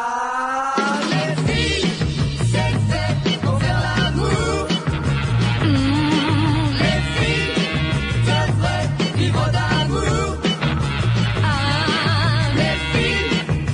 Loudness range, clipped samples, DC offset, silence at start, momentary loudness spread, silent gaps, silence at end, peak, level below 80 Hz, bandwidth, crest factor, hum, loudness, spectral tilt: 1 LU; under 0.1%; under 0.1%; 0 s; 3 LU; none; 0 s; -4 dBFS; -32 dBFS; 10.5 kHz; 14 dB; none; -19 LUFS; -5.5 dB/octave